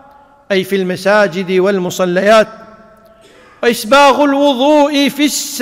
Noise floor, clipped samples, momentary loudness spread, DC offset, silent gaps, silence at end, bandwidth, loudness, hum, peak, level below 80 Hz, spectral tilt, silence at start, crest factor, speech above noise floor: -43 dBFS; under 0.1%; 8 LU; under 0.1%; none; 0 s; 16.5 kHz; -12 LUFS; none; 0 dBFS; -52 dBFS; -4 dB/octave; 0.5 s; 12 dB; 32 dB